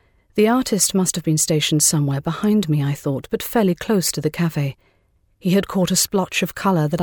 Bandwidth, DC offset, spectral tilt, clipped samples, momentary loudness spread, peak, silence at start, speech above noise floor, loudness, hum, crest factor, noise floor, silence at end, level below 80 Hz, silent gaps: over 20 kHz; under 0.1%; -4.5 dB/octave; under 0.1%; 7 LU; -4 dBFS; 0.35 s; 42 dB; -19 LUFS; none; 16 dB; -61 dBFS; 0 s; -50 dBFS; none